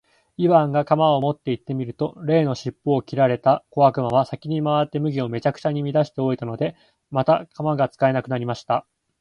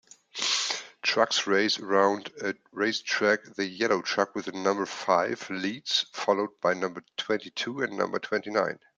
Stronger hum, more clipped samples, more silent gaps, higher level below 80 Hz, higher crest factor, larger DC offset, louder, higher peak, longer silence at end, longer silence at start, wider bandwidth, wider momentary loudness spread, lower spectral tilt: neither; neither; neither; first, -60 dBFS vs -78 dBFS; about the same, 18 dB vs 22 dB; neither; first, -22 LUFS vs -27 LUFS; about the same, -4 dBFS vs -6 dBFS; first, 0.4 s vs 0.25 s; about the same, 0.4 s vs 0.35 s; second, 7.2 kHz vs 9.4 kHz; about the same, 9 LU vs 8 LU; first, -8 dB/octave vs -2.5 dB/octave